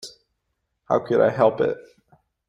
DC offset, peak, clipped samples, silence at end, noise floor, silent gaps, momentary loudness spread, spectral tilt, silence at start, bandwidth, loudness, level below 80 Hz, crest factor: under 0.1%; -4 dBFS; under 0.1%; 0.7 s; -76 dBFS; none; 15 LU; -6.5 dB/octave; 0.05 s; 11 kHz; -21 LUFS; -64 dBFS; 20 dB